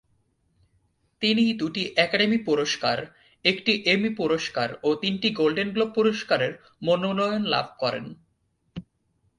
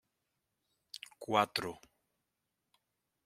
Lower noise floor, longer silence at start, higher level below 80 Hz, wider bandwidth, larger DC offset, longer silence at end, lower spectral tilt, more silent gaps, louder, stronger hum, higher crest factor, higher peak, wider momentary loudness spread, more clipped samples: second, -71 dBFS vs -86 dBFS; about the same, 1.2 s vs 1.2 s; first, -64 dBFS vs -80 dBFS; second, 11 kHz vs 16 kHz; neither; second, 0.6 s vs 1.5 s; about the same, -4.5 dB/octave vs -4 dB/octave; neither; first, -24 LUFS vs -34 LUFS; neither; second, 22 dB vs 28 dB; first, -4 dBFS vs -12 dBFS; second, 10 LU vs 20 LU; neither